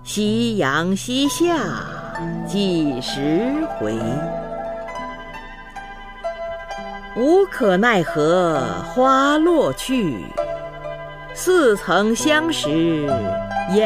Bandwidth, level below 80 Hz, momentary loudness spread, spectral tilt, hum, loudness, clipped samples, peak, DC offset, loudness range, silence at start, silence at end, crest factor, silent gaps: 15.5 kHz; -42 dBFS; 15 LU; -5 dB/octave; none; -19 LUFS; under 0.1%; -4 dBFS; under 0.1%; 8 LU; 0 s; 0 s; 16 dB; none